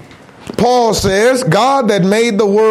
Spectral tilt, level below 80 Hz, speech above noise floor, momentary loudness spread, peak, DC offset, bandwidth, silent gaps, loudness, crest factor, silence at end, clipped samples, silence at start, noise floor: -5 dB/octave; -40 dBFS; 22 dB; 2 LU; -2 dBFS; under 0.1%; 15.5 kHz; none; -12 LUFS; 10 dB; 0 s; under 0.1%; 0.4 s; -33 dBFS